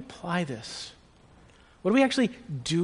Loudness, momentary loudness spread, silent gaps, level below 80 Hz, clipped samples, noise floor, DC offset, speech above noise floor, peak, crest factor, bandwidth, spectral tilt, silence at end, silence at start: -28 LUFS; 15 LU; none; -60 dBFS; under 0.1%; -56 dBFS; under 0.1%; 29 dB; -8 dBFS; 20 dB; 10.5 kHz; -5 dB/octave; 0 s; 0 s